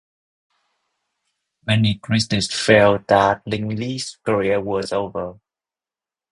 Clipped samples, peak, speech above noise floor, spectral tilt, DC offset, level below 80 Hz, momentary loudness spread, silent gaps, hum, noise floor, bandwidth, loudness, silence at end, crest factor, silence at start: under 0.1%; 0 dBFS; over 71 dB; -5 dB/octave; under 0.1%; -50 dBFS; 12 LU; none; none; under -90 dBFS; 11 kHz; -19 LUFS; 1 s; 20 dB; 1.65 s